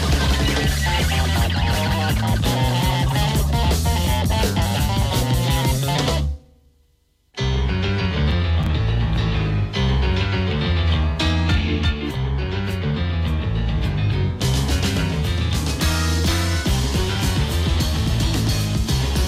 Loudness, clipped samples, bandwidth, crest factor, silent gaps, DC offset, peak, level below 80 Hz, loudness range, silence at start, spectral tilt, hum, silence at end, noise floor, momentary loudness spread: -20 LUFS; under 0.1%; 16 kHz; 10 dB; none; under 0.1%; -8 dBFS; -24 dBFS; 3 LU; 0 s; -5 dB/octave; none; 0 s; -61 dBFS; 3 LU